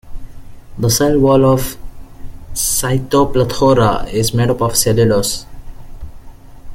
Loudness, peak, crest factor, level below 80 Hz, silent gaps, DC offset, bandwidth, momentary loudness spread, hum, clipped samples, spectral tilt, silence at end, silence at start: -14 LUFS; 0 dBFS; 16 dB; -30 dBFS; none; under 0.1%; 17 kHz; 12 LU; none; under 0.1%; -5 dB/octave; 0 s; 0.05 s